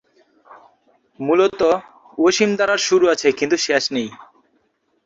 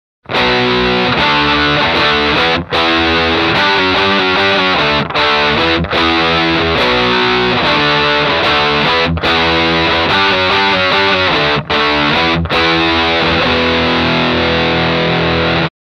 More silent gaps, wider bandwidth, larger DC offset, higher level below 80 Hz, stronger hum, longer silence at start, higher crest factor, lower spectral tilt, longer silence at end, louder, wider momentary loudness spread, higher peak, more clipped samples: neither; second, 7.8 kHz vs 11.5 kHz; neither; second, -60 dBFS vs -32 dBFS; neither; first, 0.5 s vs 0.3 s; first, 18 dB vs 12 dB; second, -3 dB/octave vs -5 dB/octave; first, 0.8 s vs 0.2 s; second, -18 LUFS vs -11 LUFS; first, 10 LU vs 2 LU; about the same, -2 dBFS vs 0 dBFS; neither